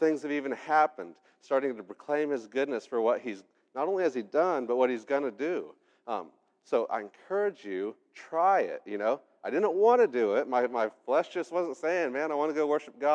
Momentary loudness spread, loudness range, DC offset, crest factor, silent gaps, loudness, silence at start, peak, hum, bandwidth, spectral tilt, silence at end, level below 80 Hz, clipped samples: 12 LU; 4 LU; under 0.1%; 18 dB; none; -29 LUFS; 0 s; -12 dBFS; none; 9.2 kHz; -5.5 dB/octave; 0 s; under -90 dBFS; under 0.1%